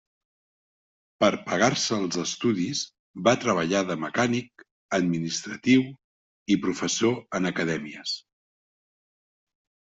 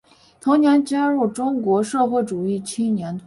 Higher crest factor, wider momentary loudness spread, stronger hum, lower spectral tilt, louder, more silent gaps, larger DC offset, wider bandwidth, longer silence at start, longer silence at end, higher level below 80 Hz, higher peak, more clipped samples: first, 22 dB vs 14 dB; about the same, 9 LU vs 8 LU; neither; second, -4 dB/octave vs -6 dB/octave; second, -25 LUFS vs -20 LUFS; first, 2.99-3.14 s, 4.71-4.89 s, 6.04-6.46 s vs none; neither; second, 8 kHz vs 11.5 kHz; first, 1.2 s vs 0.45 s; first, 1.75 s vs 0.05 s; about the same, -64 dBFS vs -62 dBFS; about the same, -6 dBFS vs -6 dBFS; neither